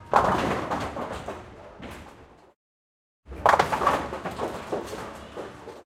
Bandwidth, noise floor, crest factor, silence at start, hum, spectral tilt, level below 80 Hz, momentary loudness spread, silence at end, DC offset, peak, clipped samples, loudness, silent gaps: 16 kHz; -50 dBFS; 26 dB; 0 s; none; -5 dB/octave; -48 dBFS; 20 LU; 0.05 s; under 0.1%; -4 dBFS; under 0.1%; -26 LUFS; 2.56-3.23 s